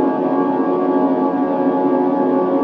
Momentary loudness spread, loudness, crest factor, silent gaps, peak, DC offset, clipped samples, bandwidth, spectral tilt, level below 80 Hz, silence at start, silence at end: 1 LU; -17 LUFS; 12 dB; none; -4 dBFS; under 0.1%; under 0.1%; 4.8 kHz; -10 dB/octave; -66 dBFS; 0 s; 0 s